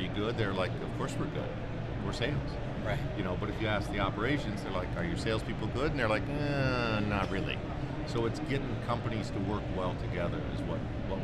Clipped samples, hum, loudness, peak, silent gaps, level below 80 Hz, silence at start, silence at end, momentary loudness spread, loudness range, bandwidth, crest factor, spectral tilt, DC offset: under 0.1%; none; -34 LUFS; -16 dBFS; none; -44 dBFS; 0 s; 0 s; 6 LU; 2 LU; 12.5 kHz; 16 dB; -6.5 dB/octave; under 0.1%